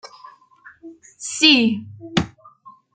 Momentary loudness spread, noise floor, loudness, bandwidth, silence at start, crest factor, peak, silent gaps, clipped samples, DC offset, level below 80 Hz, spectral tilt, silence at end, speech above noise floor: 19 LU; -49 dBFS; -17 LUFS; 9.6 kHz; 0.05 s; 22 dB; 0 dBFS; none; under 0.1%; under 0.1%; -56 dBFS; -3 dB/octave; 0.25 s; 30 dB